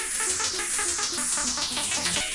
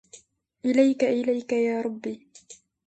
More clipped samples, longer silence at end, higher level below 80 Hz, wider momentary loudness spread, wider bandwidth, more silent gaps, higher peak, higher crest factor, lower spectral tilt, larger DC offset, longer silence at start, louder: neither; second, 0 s vs 0.35 s; first, -52 dBFS vs -72 dBFS; second, 1 LU vs 14 LU; first, 11.5 kHz vs 9 kHz; neither; about the same, -8 dBFS vs -8 dBFS; about the same, 18 dB vs 18 dB; second, 0.5 dB/octave vs -5 dB/octave; neither; second, 0 s vs 0.15 s; about the same, -24 LUFS vs -25 LUFS